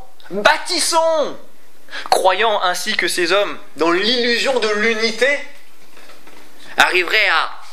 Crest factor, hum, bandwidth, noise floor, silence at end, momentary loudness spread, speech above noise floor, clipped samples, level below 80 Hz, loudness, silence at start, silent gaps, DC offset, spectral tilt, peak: 18 dB; none; 16 kHz; -46 dBFS; 0 s; 10 LU; 30 dB; under 0.1%; -62 dBFS; -16 LUFS; 0.25 s; none; 5%; -1.5 dB/octave; 0 dBFS